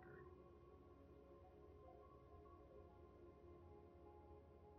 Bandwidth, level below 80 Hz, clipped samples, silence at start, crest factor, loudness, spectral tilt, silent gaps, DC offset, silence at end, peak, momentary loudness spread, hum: 4.8 kHz; -72 dBFS; under 0.1%; 0 s; 12 dB; -65 LUFS; -7.5 dB/octave; none; under 0.1%; 0 s; -52 dBFS; 2 LU; none